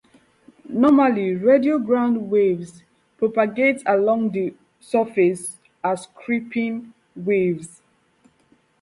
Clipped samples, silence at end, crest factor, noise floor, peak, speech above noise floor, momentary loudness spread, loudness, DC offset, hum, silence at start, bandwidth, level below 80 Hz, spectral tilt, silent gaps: under 0.1%; 1.15 s; 18 dB; -60 dBFS; -4 dBFS; 41 dB; 13 LU; -20 LUFS; under 0.1%; none; 0.7 s; 11.5 kHz; -66 dBFS; -6.5 dB/octave; none